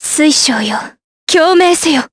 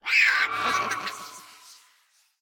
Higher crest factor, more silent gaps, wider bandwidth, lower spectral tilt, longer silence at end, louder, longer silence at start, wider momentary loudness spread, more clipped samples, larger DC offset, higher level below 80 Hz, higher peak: second, 12 dB vs 20 dB; first, 1.04-1.27 s vs none; second, 11 kHz vs 17.5 kHz; about the same, -1.5 dB/octave vs -0.5 dB/octave; second, 0.05 s vs 0.7 s; first, -10 LUFS vs -23 LUFS; about the same, 0 s vs 0.05 s; second, 14 LU vs 22 LU; neither; neither; first, -54 dBFS vs -68 dBFS; first, 0 dBFS vs -6 dBFS